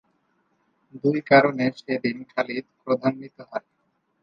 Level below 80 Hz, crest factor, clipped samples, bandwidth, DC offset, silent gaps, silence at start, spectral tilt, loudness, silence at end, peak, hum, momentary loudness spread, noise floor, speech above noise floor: -72 dBFS; 24 dB; under 0.1%; 7.4 kHz; under 0.1%; none; 0.95 s; -7.5 dB/octave; -23 LUFS; 0.65 s; -2 dBFS; none; 18 LU; -69 dBFS; 46 dB